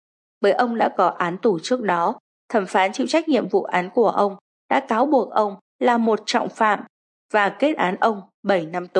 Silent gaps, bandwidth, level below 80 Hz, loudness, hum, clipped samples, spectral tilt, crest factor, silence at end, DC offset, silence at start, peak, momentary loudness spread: 2.20-2.48 s, 4.41-4.69 s, 5.61-5.79 s, 6.89-7.29 s, 8.34-8.43 s; 10.5 kHz; -80 dBFS; -21 LUFS; none; under 0.1%; -5 dB/octave; 16 dB; 0 s; under 0.1%; 0.4 s; -4 dBFS; 5 LU